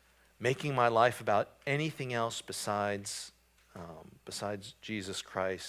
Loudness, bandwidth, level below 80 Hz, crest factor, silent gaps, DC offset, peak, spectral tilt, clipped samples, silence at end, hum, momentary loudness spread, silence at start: -33 LUFS; 16 kHz; -66 dBFS; 22 dB; none; under 0.1%; -12 dBFS; -4.5 dB/octave; under 0.1%; 0 s; none; 20 LU; 0.4 s